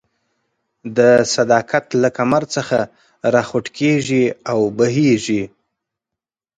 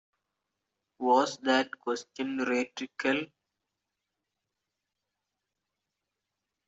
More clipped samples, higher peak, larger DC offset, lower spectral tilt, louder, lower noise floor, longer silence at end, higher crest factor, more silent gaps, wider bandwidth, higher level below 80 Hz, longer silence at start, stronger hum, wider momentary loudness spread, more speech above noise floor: neither; first, 0 dBFS vs -10 dBFS; neither; first, -5 dB/octave vs -3.5 dB/octave; first, -17 LUFS vs -30 LUFS; about the same, -86 dBFS vs -86 dBFS; second, 1.1 s vs 3.45 s; second, 18 dB vs 24 dB; neither; first, 9.6 kHz vs 8 kHz; first, -58 dBFS vs -78 dBFS; second, 0.85 s vs 1 s; neither; about the same, 9 LU vs 10 LU; first, 69 dB vs 57 dB